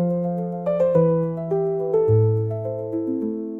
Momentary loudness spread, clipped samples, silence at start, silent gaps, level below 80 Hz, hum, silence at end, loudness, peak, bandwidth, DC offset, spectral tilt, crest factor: 8 LU; under 0.1%; 0 s; none; -56 dBFS; none; 0 s; -22 LUFS; -8 dBFS; 3.2 kHz; under 0.1%; -12 dB/octave; 14 dB